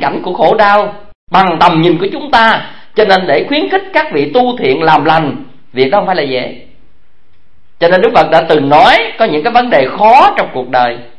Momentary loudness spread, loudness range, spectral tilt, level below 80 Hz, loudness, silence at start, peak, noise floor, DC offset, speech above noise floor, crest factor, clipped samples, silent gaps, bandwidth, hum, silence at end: 9 LU; 5 LU; -6 dB/octave; -44 dBFS; -9 LUFS; 0 s; 0 dBFS; -55 dBFS; 3%; 45 dB; 10 dB; 0.8%; 1.15-1.27 s; 11 kHz; none; 0.15 s